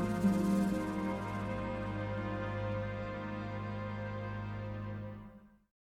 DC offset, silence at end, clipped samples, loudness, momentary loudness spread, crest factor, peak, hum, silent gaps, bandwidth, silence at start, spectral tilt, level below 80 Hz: under 0.1%; 0.5 s; under 0.1%; -37 LUFS; 11 LU; 18 dB; -18 dBFS; none; none; 14.5 kHz; 0 s; -7.5 dB/octave; -54 dBFS